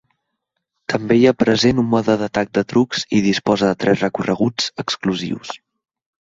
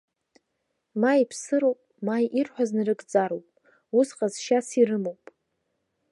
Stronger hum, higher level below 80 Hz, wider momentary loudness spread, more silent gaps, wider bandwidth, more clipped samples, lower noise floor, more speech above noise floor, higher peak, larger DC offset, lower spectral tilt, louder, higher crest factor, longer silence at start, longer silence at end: neither; first, -52 dBFS vs -82 dBFS; about the same, 10 LU vs 8 LU; neither; second, 7.8 kHz vs 11.5 kHz; neither; about the same, -76 dBFS vs -78 dBFS; first, 59 dB vs 54 dB; first, -2 dBFS vs -8 dBFS; neither; about the same, -5.5 dB/octave vs -5 dB/octave; first, -18 LUFS vs -25 LUFS; about the same, 16 dB vs 18 dB; about the same, 0.9 s vs 0.95 s; second, 0.75 s vs 1 s